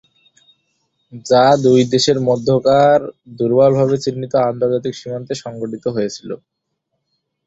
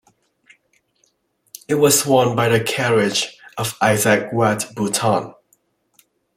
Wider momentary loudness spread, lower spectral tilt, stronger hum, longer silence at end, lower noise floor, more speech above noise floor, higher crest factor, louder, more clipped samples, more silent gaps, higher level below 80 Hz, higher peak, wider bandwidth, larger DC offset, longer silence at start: first, 15 LU vs 12 LU; first, -5.5 dB/octave vs -4 dB/octave; neither; about the same, 1.1 s vs 1.05 s; first, -73 dBFS vs -65 dBFS; first, 58 dB vs 48 dB; about the same, 16 dB vs 18 dB; first, -15 LUFS vs -18 LUFS; neither; neither; about the same, -56 dBFS vs -58 dBFS; about the same, -2 dBFS vs -2 dBFS; second, 8 kHz vs 16.5 kHz; neither; second, 1.15 s vs 1.7 s